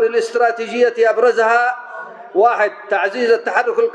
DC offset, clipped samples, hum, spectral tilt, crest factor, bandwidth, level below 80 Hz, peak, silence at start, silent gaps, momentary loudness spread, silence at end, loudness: under 0.1%; under 0.1%; none; -3 dB/octave; 14 dB; 9.8 kHz; -86 dBFS; -2 dBFS; 0 s; none; 7 LU; 0 s; -16 LUFS